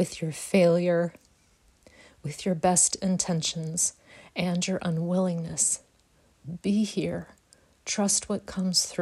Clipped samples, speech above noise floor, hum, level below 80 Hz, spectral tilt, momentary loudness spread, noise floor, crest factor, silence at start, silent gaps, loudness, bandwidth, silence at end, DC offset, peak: under 0.1%; 37 dB; none; -62 dBFS; -4 dB/octave; 12 LU; -63 dBFS; 18 dB; 0 s; none; -26 LUFS; 14 kHz; 0 s; under 0.1%; -10 dBFS